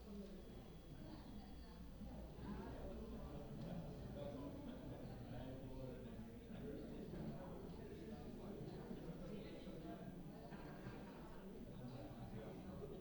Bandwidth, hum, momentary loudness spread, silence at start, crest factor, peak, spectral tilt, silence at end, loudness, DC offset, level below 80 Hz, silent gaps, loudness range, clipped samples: over 20 kHz; none; 5 LU; 0 s; 14 dB; -38 dBFS; -7.5 dB/octave; 0 s; -54 LUFS; under 0.1%; -60 dBFS; none; 2 LU; under 0.1%